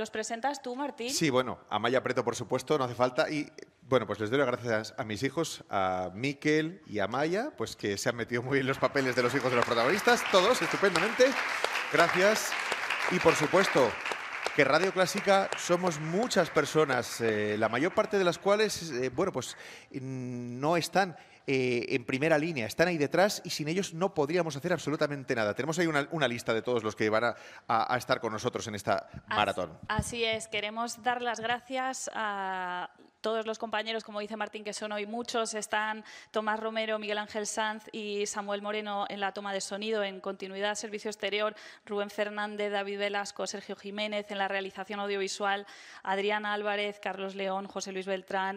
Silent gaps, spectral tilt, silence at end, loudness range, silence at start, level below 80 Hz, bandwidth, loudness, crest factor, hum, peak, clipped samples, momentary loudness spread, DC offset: none; -4 dB/octave; 0 s; 7 LU; 0 s; -64 dBFS; 15.5 kHz; -30 LUFS; 22 dB; none; -8 dBFS; under 0.1%; 10 LU; under 0.1%